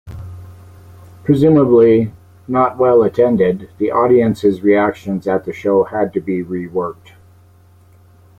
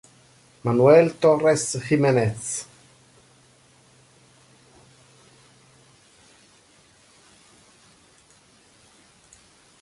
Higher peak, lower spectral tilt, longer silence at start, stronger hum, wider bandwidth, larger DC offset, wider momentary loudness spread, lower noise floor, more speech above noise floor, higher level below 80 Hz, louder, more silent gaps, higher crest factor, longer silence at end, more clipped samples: about the same, -2 dBFS vs -4 dBFS; first, -9 dB/octave vs -5.5 dB/octave; second, 0.05 s vs 0.65 s; neither; second, 9.2 kHz vs 11.5 kHz; neither; second, 12 LU vs 15 LU; second, -47 dBFS vs -56 dBFS; second, 33 dB vs 38 dB; first, -50 dBFS vs -62 dBFS; first, -15 LUFS vs -20 LUFS; neither; second, 14 dB vs 22 dB; second, 1.45 s vs 7.2 s; neither